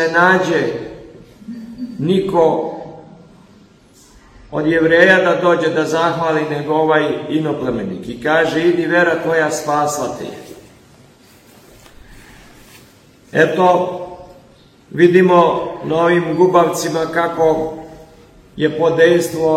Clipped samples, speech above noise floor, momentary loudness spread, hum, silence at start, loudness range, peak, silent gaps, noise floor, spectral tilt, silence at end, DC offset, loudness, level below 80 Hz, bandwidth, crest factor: under 0.1%; 33 dB; 17 LU; none; 0 s; 7 LU; 0 dBFS; none; -47 dBFS; -5.5 dB/octave; 0 s; under 0.1%; -15 LUFS; -50 dBFS; 15.5 kHz; 16 dB